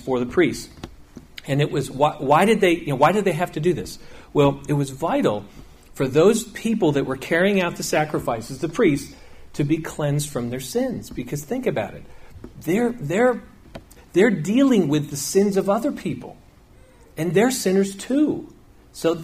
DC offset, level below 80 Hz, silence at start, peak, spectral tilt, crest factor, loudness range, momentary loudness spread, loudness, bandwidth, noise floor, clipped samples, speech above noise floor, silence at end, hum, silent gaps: under 0.1%; -48 dBFS; 0 s; -4 dBFS; -5.5 dB/octave; 18 dB; 5 LU; 14 LU; -21 LUFS; 15.5 kHz; -50 dBFS; under 0.1%; 29 dB; 0 s; none; none